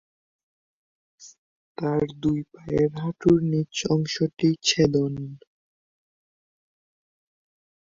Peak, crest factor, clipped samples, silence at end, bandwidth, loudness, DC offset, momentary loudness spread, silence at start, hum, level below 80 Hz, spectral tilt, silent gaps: -6 dBFS; 20 dB; under 0.1%; 2.55 s; 7.6 kHz; -24 LUFS; under 0.1%; 10 LU; 1.2 s; none; -54 dBFS; -5.5 dB/octave; 1.38-1.75 s